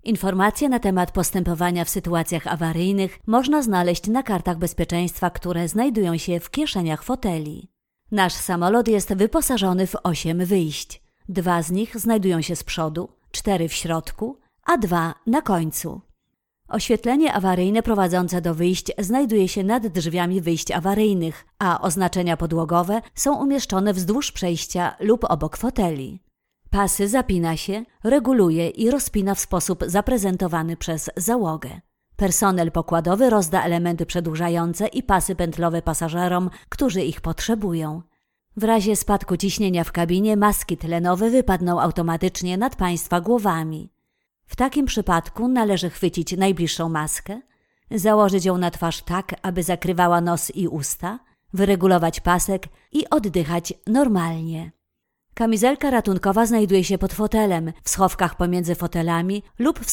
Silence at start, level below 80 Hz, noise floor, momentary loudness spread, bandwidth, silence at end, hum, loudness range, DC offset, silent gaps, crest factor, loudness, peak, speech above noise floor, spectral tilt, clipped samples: 0.05 s; -38 dBFS; -78 dBFS; 8 LU; 18 kHz; 0 s; none; 3 LU; under 0.1%; none; 18 dB; -21 LUFS; -4 dBFS; 57 dB; -5 dB/octave; under 0.1%